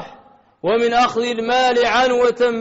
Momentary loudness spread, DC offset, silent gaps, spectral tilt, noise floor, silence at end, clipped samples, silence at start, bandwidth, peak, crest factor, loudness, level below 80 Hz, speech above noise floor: 6 LU; under 0.1%; none; -1 dB/octave; -48 dBFS; 0 s; under 0.1%; 0 s; 8 kHz; -6 dBFS; 12 dB; -17 LUFS; -52 dBFS; 32 dB